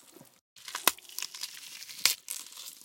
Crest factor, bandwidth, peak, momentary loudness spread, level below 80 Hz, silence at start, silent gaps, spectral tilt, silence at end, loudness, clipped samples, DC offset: 36 dB; 17 kHz; 0 dBFS; 15 LU; -80 dBFS; 0 s; 0.41-0.56 s; 2 dB/octave; 0 s; -32 LUFS; under 0.1%; under 0.1%